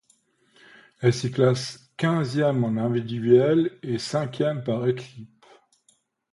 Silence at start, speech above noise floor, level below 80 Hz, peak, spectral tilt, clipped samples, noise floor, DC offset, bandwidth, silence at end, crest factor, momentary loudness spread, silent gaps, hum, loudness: 1 s; 43 dB; -64 dBFS; -6 dBFS; -7 dB/octave; under 0.1%; -66 dBFS; under 0.1%; 11.5 kHz; 1.05 s; 20 dB; 9 LU; none; none; -24 LUFS